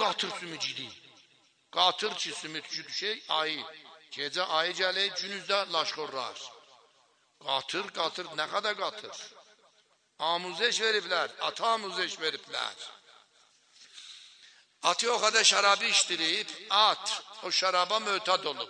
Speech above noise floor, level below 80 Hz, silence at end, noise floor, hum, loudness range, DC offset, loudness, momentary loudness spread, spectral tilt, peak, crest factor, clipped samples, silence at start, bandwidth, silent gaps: 38 dB; -88 dBFS; 0 s; -68 dBFS; none; 9 LU; under 0.1%; -29 LUFS; 18 LU; 0 dB/octave; -8 dBFS; 24 dB; under 0.1%; 0 s; 10.5 kHz; none